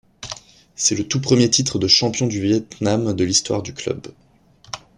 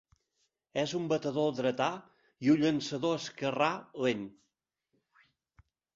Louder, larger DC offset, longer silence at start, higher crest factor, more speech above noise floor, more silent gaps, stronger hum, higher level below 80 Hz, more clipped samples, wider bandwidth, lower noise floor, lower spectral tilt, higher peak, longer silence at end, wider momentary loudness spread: first, -18 LUFS vs -32 LUFS; neither; second, 0.2 s vs 0.75 s; about the same, 20 dB vs 20 dB; second, 32 dB vs 51 dB; neither; neither; first, -52 dBFS vs -72 dBFS; neither; first, 11.5 kHz vs 7.8 kHz; second, -51 dBFS vs -82 dBFS; second, -3.5 dB/octave vs -5.5 dB/octave; first, -2 dBFS vs -12 dBFS; second, 0.2 s vs 1.65 s; first, 18 LU vs 9 LU